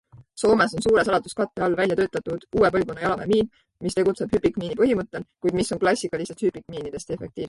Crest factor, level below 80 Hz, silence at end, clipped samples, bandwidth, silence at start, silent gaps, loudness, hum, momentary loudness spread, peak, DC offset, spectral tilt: 16 dB; -50 dBFS; 0 s; under 0.1%; 11.5 kHz; 0.15 s; none; -23 LUFS; none; 12 LU; -8 dBFS; under 0.1%; -5.5 dB/octave